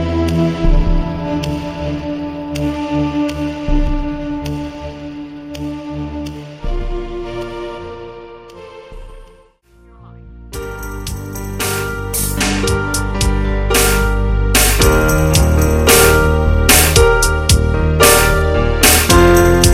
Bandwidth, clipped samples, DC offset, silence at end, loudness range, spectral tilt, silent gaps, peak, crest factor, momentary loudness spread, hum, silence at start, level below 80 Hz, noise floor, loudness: 17 kHz; under 0.1%; under 0.1%; 0 s; 19 LU; -4 dB/octave; none; 0 dBFS; 14 dB; 19 LU; none; 0 s; -20 dBFS; -47 dBFS; -14 LUFS